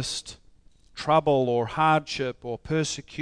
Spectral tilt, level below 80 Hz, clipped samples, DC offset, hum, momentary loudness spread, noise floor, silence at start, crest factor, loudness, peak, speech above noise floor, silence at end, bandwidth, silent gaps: -4.5 dB/octave; -54 dBFS; under 0.1%; under 0.1%; none; 13 LU; -55 dBFS; 0 s; 18 dB; -25 LUFS; -8 dBFS; 30 dB; 0 s; 10.5 kHz; none